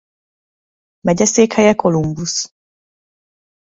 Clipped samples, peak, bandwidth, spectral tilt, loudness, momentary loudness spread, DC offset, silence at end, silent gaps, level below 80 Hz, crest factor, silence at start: under 0.1%; 0 dBFS; 8 kHz; -4.5 dB/octave; -15 LUFS; 10 LU; under 0.1%; 1.25 s; none; -50 dBFS; 18 dB; 1.05 s